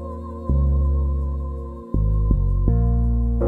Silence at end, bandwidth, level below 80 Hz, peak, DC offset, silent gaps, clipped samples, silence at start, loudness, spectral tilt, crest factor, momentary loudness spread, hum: 0 s; 1.7 kHz; -20 dBFS; -4 dBFS; under 0.1%; none; under 0.1%; 0 s; -22 LUFS; -12.5 dB/octave; 16 dB; 10 LU; none